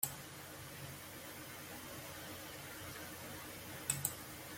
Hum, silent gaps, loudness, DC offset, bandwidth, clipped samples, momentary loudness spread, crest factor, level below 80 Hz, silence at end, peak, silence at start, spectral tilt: none; none; -45 LUFS; under 0.1%; 16.5 kHz; under 0.1%; 10 LU; 30 dB; -70 dBFS; 0 s; -16 dBFS; 0 s; -2.5 dB/octave